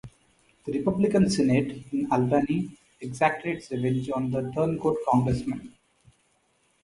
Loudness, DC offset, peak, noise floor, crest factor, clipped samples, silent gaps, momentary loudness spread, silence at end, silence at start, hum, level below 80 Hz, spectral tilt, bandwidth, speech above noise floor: -26 LUFS; under 0.1%; -8 dBFS; -68 dBFS; 18 dB; under 0.1%; none; 12 LU; 1.15 s; 0.05 s; none; -52 dBFS; -7 dB/octave; 11.5 kHz; 43 dB